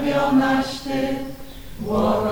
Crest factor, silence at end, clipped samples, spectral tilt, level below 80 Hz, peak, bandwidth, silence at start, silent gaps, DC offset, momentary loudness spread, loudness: 14 dB; 0 s; under 0.1%; -6 dB/octave; -42 dBFS; -8 dBFS; over 20 kHz; 0 s; none; under 0.1%; 17 LU; -21 LUFS